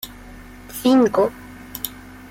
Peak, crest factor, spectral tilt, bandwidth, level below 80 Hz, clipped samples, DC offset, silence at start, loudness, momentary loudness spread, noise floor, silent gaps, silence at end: -6 dBFS; 16 dB; -5 dB/octave; 17 kHz; -48 dBFS; under 0.1%; under 0.1%; 0.05 s; -19 LUFS; 25 LU; -40 dBFS; none; 0.35 s